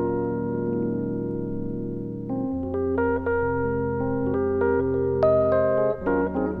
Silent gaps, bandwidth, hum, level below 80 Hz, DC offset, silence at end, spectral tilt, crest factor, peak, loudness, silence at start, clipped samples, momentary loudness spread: none; 4.9 kHz; none; -44 dBFS; under 0.1%; 0 s; -11.5 dB/octave; 14 dB; -10 dBFS; -25 LUFS; 0 s; under 0.1%; 9 LU